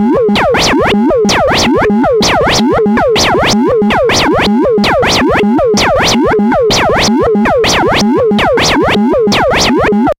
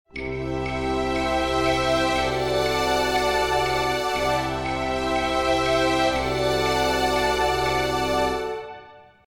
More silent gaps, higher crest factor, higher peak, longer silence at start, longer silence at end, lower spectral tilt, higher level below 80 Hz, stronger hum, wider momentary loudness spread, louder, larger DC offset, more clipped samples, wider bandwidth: neither; second, 8 dB vs 14 dB; first, 0 dBFS vs -8 dBFS; second, 0 s vs 0.15 s; second, 0.05 s vs 0.25 s; about the same, -4 dB/octave vs -4 dB/octave; first, -28 dBFS vs -38 dBFS; neither; second, 1 LU vs 6 LU; first, -9 LUFS vs -23 LUFS; neither; neither; about the same, 16.5 kHz vs 17 kHz